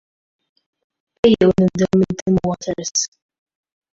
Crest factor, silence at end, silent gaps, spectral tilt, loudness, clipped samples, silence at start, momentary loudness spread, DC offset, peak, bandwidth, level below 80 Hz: 18 dB; 0.9 s; 2.22-2.26 s; -5.5 dB/octave; -17 LUFS; under 0.1%; 1.25 s; 9 LU; under 0.1%; -2 dBFS; 7.8 kHz; -46 dBFS